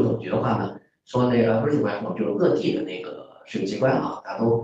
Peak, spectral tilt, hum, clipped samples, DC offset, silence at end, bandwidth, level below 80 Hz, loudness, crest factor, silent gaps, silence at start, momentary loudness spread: -8 dBFS; -8 dB/octave; none; under 0.1%; under 0.1%; 0 s; 8 kHz; -58 dBFS; -24 LUFS; 16 dB; none; 0 s; 12 LU